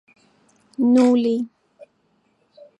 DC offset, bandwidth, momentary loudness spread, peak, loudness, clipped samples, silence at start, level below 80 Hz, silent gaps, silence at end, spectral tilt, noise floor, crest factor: under 0.1%; 8.8 kHz; 18 LU; -6 dBFS; -18 LUFS; under 0.1%; 0.8 s; -76 dBFS; none; 0.95 s; -6 dB/octave; -65 dBFS; 16 dB